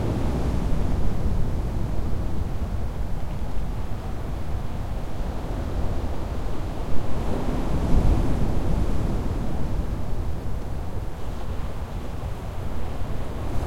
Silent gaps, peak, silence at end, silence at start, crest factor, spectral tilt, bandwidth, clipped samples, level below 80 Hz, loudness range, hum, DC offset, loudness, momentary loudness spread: none; -6 dBFS; 0 s; 0 s; 16 dB; -7.5 dB/octave; 14 kHz; under 0.1%; -28 dBFS; 5 LU; none; under 0.1%; -29 LUFS; 7 LU